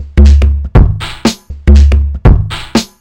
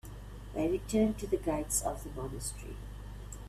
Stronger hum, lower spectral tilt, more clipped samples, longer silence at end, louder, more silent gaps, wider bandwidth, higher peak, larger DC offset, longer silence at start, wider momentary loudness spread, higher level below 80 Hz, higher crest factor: second, none vs 50 Hz at -45 dBFS; first, -6.5 dB/octave vs -5 dB/octave; first, 6% vs under 0.1%; first, 0.15 s vs 0 s; first, -10 LUFS vs -34 LUFS; neither; second, 9.8 kHz vs 16 kHz; first, 0 dBFS vs -18 dBFS; neither; about the same, 0 s vs 0.05 s; second, 8 LU vs 16 LU; first, -10 dBFS vs -46 dBFS; second, 8 dB vs 18 dB